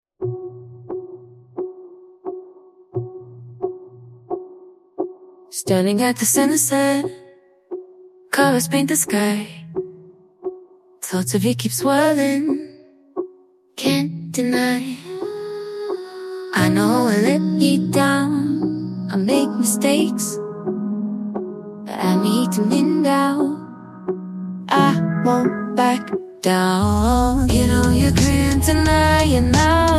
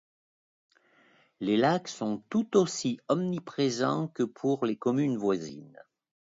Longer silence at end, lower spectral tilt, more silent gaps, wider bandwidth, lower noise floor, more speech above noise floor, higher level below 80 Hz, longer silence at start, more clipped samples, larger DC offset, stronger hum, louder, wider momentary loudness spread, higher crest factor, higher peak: second, 0 s vs 0.55 s; about the same, -5 dB/octave vs -5.5 dB/octave; neither; first, 15 kHz vs 7.8 kHz; second, -50 dBFS vs -64 dBFS; about the same, 33 dB vs 35 dB; first, -34 dBFS vs -74 dBFS; second, 0.2 s vs 1.4 s; neither; neither; neither; first, -19 LUFS vs -29 LUFS; first, 17 LU vs 8 LU; about the same, 18 dB vs 20 dB; first, -2 dBFS vs -10 dBFS